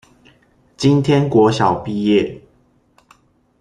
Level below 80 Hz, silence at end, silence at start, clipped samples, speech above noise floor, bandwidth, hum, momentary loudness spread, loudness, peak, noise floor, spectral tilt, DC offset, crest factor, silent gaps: -52 dBFS; 1.25 s; 0.8 s; under 0.1%; 42 dB; 10.5 kHz; none; 6 LU; -16 LUFS; -2 dBFS; -57 dBFS; -7 dB/octave; under 0.1%; 16 dB; none